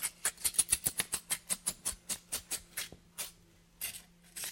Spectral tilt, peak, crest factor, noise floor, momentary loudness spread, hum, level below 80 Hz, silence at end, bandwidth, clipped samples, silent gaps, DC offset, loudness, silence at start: 0.5 dB/octave; -12 dBFS; 28 dB; -63 dBFS; 13 LU; none; -62 dBFS; 0 s; 17 kHz; under 0.1%; none; under 0.1%; -35 LUFS; 0 s